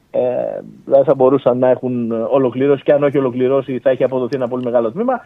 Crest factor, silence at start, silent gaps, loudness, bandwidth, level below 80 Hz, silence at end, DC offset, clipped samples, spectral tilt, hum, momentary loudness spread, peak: 14 dB; 0.15 s; none; -16 LUFS; 5.8 kHz; -62 dBFS; 0.05 s; under 0.1%; under 0.1%; -9.5 dB/octave; none; 7 LU; 0 dBFS